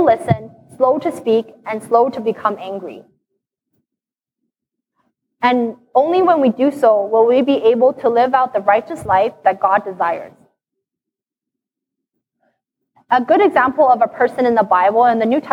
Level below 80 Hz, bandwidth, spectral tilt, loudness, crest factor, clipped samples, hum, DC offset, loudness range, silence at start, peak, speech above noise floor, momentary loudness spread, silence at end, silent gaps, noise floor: -58 dBFS; 12 kHz; -7 dB/octave; -15 LUFS; 16 dB; under 0.1%; none; under 0.1%; 11 LU; 0 s; -2 dBFS; 70 dB; 8 LU; 0 s; none; -85 dBFS